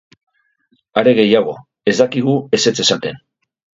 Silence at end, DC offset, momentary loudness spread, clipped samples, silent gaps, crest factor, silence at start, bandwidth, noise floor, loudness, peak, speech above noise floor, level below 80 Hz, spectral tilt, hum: 0.6 s; under 0.1%; 9 LU; under 0.1%; none; 16 dB; 0.95 s; 8 kHz; -62 dBFS; -15 LUFS; 0 dBFS; 48 dB; -60 dBFS; -4 dB/octave; none